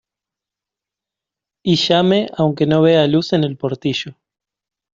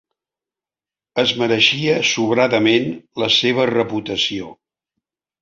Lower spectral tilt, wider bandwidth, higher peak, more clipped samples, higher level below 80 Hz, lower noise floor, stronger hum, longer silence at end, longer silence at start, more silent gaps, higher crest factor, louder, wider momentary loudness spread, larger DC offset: first, -6.5 dB/octave vs -4 dB/octave; about the same, 7.6 kHz vs 7.6 kHz; about the same, -2 dBFS vs -2 dBFS; neither; about the same, -58 dBFS vs -58 dBFS; second, -86 dBFS vs under -90 dBFS; neither; about the same, 0.8 s vs 0.9 s; first, 1.65 s vs 1.15 s; neither; about the same, 16 dB vs 18 dB; about the same, -16 LUFS vs -17 LUFS; about the same, 10 LU vs 10 LU; neither